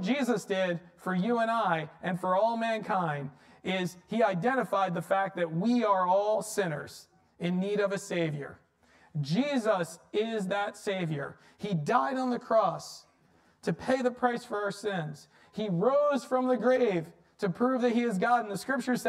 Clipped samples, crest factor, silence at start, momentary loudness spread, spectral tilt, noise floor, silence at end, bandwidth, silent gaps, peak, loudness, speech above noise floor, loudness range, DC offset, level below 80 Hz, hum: under 0.1%; 18 dB; 0 s; 11 LU; -6 dB/octave; -65 dBFS; 0 s; 15 kHz; none; -12 dBFS; -30 LUFS; 36 dB; 4 LU; under 0.1%; -74 dBFS; none